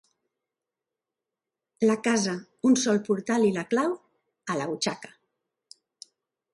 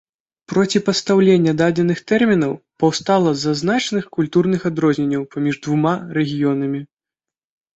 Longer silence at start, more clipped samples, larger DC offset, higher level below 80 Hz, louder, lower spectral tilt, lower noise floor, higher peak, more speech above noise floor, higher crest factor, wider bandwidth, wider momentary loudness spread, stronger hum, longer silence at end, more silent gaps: first, 1.8 s vs 0.5 s; neither; neither; second, -74 dBFS vs -58 dBFS; second, -26 LUFS vs -18 LUFS; second, -4.5 dB/octave vs -6 dB/octave; about the same, -88 dBFS vs -88 dBFS; second, -10 dBFS vs -2 dBFS; second, 63 dB vs 71 dB; about the same, 18 dB vs 16 dB; first, 11.5 kHz vs 8.2 kHz; about the same, 9 LU vs 7 LU; neither; first, 1.45 s vs 0.9 s; neither